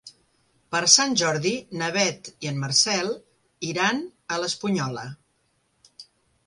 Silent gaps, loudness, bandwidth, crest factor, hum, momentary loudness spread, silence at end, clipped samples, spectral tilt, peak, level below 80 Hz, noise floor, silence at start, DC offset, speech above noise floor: none; -23 LUFS; 11.5 kHz; 24 dB; none; 16 LU; 0.45 s; under 0.1%; -2 dB/octave; -2 dBFS; -66 dBFS; -69 dBFS; 0.05 s; under 0.1%; 45 dB